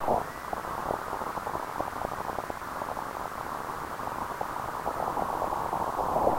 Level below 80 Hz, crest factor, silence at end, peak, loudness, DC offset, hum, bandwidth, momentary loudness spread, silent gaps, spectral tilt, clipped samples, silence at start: -52 dBFS; 20 dB; 0 s; -12 dBFS; -33 LUFS; under 0.1%; none; 16 kHz; 5 LU; none; -5 dB/octave; under 0.1%; 0 s